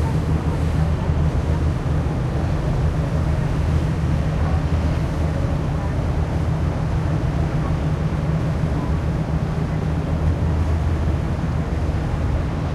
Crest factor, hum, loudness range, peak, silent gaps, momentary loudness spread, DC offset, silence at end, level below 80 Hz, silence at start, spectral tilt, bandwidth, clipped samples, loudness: 14 dB; none; 1 LU; -6 dBFS; none; 2 LU; under 0.1%; 0 s; -26 dBFS; 0 s; -8 dB/octave; 11 kHz; under 0.1%; -22 LUFS